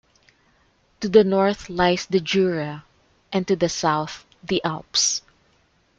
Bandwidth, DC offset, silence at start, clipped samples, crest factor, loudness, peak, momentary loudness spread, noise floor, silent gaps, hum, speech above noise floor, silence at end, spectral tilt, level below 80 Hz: 9.2 kHz; under 0.1%; 1 s; under 0.1%; 20 dB; -21 LUFS; -2 dBFS; 13 LU; -62 dBFS; none; none; 41 dB; 0.8 s; -4 dB/octave; -54 dBFS